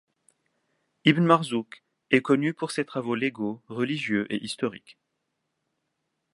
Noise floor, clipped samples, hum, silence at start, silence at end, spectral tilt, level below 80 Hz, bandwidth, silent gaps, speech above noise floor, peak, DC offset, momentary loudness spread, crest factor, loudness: -79 dBFS; under 0.1%; none; 1.05 s; 1.55 s; -6 dB/octave; -72 dBFS; 11.5 kHz; none; 54 dB; -2 dBFS; under 0.1%; 11 LU; 26 dB; -26 LUFS